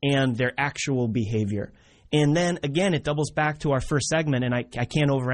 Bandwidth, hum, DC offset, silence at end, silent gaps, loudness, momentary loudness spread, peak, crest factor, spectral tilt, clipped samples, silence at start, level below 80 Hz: 10.5 kHz; none; under 0.1%; 0 s; none; -25 LUFS; 5 LU; -10 dBFS; 14 dB; -5.5 dB/octave; under 0.1%; 0 s; -48 dBFS